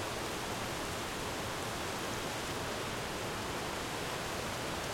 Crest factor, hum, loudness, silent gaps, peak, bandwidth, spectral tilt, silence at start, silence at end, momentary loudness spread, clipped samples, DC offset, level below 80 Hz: 14 dB; none; -37 LUFS; none; -24 dBFS; 16.5 kHz; -3 dB/octave; 0 s; 0 s; 1 LU; under 0.1%; under 0.1%; -54 dBFS